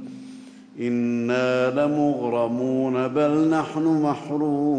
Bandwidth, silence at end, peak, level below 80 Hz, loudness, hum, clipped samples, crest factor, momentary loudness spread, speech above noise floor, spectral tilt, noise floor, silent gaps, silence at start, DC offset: 9.6 kHz; 0 s; -10 dBFS; -64 dBFS; -23 LUFS; none; under 0.1%; 12 dB; 9 LU; 21 dB; -7.5 dB/octave; -42 dBFS; none; 0 s; under 0.1%